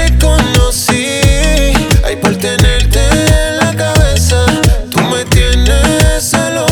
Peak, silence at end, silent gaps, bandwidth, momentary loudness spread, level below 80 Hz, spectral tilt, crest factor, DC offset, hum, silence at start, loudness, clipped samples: 0 dBFS; 0 s; none; over 20 kHz; 3 LU; -12 dBFS; -4.5 dB/octave; 10 dB; under 0.1%; none; 0 s; -10 LUFS; under 0.1%